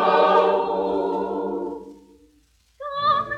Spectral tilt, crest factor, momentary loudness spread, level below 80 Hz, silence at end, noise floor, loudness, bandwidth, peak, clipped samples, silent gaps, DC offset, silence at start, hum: -6 dB/octave; 18 dB; 16 LU; -58 dBFS; 0 s; -60 dBFS; -22 LUFS; 8.2 kHz; -4 dBFS; under 0.1%; none; under 0.1%; 0 s; none